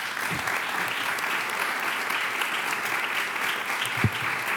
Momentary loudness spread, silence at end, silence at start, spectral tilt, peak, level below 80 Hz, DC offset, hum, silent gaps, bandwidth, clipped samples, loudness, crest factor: 2 LU; 0 s; 0 s; -2.5 dB/octave; -10 dBFS; -62 dBFS; under 0.1%; none; none; 19.5 kHz; under 0.1%; -26 LUFS; 18 dB